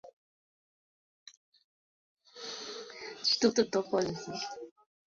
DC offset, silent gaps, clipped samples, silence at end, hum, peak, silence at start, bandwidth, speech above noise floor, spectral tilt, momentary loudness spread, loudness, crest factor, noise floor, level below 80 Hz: under 0.1%; 0.13-1.26 s, 1.37-1.52 s, 1.64-2.17 s; under 0.1%; 0.35 s; none; -12 dBFS; 0.05 s; 7.6 kHz; over 59 dB; -2.5 dB/octave; 18 LU; -32 LUFS; 24 dB; under -90 dBFS; -74 dBFS